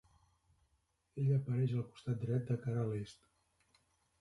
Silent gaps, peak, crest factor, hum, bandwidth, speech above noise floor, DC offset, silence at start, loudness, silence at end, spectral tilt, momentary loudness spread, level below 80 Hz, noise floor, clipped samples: none; -24 dBFS; 16 dB; none; 11.5 kHz; 43 dB; under 0.1%; 1.15 s; -38 LUFS; 1.1 s; -9 dB/octave; 9 LU; -70 dBFS; -79 dBFS; under 0.1%